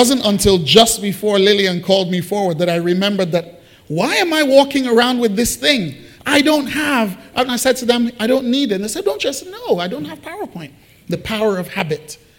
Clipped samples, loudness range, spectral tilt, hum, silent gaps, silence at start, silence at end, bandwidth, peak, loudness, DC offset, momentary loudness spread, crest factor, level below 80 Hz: under 0.1%; 6 LU; -4 dB/octave; none; none; 0 s; 0.25 s; 17 kHz; 0 dBFS; -15 LUFS; under 0.1%; 14 LU; 16 dB; -44 dBFS